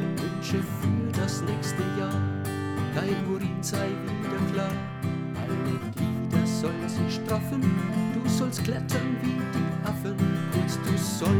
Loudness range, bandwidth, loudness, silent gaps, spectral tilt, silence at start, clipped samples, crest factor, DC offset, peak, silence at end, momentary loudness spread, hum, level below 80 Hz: 2 LU; 19.5 kHz; -28 LUFS; none; -6 dB/octave; 0 s; under 0.1%; 16 dB; under 0.1%; -10 dBFS; 0 s; 5 LU; none; -56 dBFS